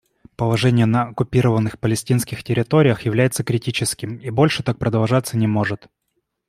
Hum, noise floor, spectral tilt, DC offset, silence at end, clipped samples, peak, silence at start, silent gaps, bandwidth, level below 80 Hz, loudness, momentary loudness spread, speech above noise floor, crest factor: none; -73 dBFS; -6 dB/octave; under 0.1%; 0.7 s; under 0.1%; -2 dBFS; 0.4 s; none; 15.5 kHz; -50 dBFS; -19 LUFS; 7 LU; 54 dB; 18 dB